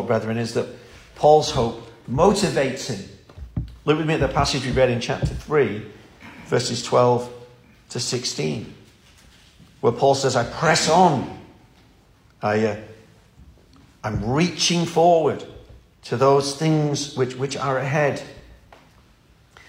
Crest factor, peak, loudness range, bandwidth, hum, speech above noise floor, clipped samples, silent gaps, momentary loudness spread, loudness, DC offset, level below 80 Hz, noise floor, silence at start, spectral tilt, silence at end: 20 dB; -2 dBFS; 4 LU; 16 kHz; none; 34 dB; under 0.1%; none; 17 LU; -21 LUFS; under 0.1%; -44 dBFS; -55 dBFS; 0 s; -5 dB/octave; 1.15 s